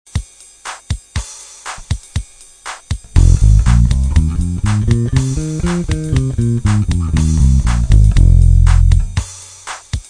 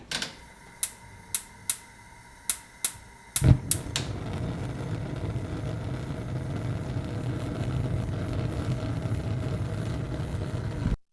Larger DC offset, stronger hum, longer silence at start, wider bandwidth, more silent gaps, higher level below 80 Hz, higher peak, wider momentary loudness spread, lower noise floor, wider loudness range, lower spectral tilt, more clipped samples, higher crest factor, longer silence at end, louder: neither; neither; first, 0.15 s vs 0 s; about the same, 10 kHz vs 11 kHz; neither; first, -16 dBFS vs -40 dBFS; first, 0 dBFS vs -4 dBFS; first, 18 LU vs 7 LU; second, -33 dBFS vs -50 dBFS; about the same, 5 LU vs 5 LU; about the same, -6 dB/octave vs -5 dB/octave; neither; second, 12 dB vs 26 dB; about the same, 0.1 s vs 0.1 s; first, -14 LUFS vs -31 LUFS